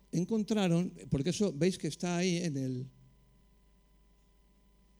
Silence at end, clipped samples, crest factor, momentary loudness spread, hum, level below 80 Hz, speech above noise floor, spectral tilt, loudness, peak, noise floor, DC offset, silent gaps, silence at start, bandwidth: 2.1 s; under 0.1%; 16 dB; 7 LU; 50 Hz at -55 dBFS; -62 dBFS; 34 dB; -6 dB/octave; -33 LUFS; -18 dBFS; -66 dBFS; under 0.1%; none; 0.15 s; 12 kHz